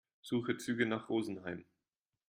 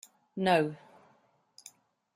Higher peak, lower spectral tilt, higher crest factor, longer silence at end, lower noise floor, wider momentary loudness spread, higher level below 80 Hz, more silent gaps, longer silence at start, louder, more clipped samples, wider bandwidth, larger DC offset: second, -18 dBFS vs -12 dBFS; about the same, -5.5 dB/octave vs -5.5 dB/octave; about the same, 20 dB vs 22 dB; second, 0.65 s vs 1.4 s; first, under -90 dBFS vs -68 dBFS; second, 10 LU vs 25 LU; about the same, -78 dBFS vs -74 dBFS; neither; about the same, 0.25 s vs 0.35 s; second, -37 LUFS vs -29 LUFS; neither; about the same, 15.5 kHz vs 15.5 kHz; neither